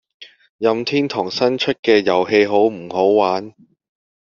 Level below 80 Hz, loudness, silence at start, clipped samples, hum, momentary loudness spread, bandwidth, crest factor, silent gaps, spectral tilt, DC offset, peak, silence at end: -62 dBFS; -17 LUFS; 0.2 s; under 0.1%; none; 5 LU; 7.2 kHz; 16 dB; 0.49-0.59 s, 1.79-1.83 s; -3 dB/octave; under 0.1%; -2 dBFS; 0.9 s